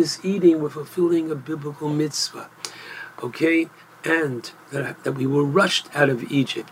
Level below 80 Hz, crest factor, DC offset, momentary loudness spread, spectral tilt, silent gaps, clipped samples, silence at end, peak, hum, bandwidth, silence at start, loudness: -72 dBFS; 20 dB; under 0.1%; 15 LU; -5 dB/octave; none; under 0.1%; 0 s; -2 dBFS; none; 16 kHz; 0 s; -22 LUFS